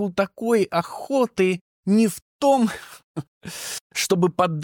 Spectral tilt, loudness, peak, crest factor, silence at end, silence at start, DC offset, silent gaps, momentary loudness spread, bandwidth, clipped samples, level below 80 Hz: -5 dB/octave; -22 LUFS; -6 dBFS; 16 dB; 0 s; 0 s; under 0.1%; 1.61-1.83 s, 2.22-2.39 s, 3.04-3.15 s, 3.28-3.41 s, 3.81-3.90 s; 16 LU; 19 kHz; under 0.1%; -62 dBFS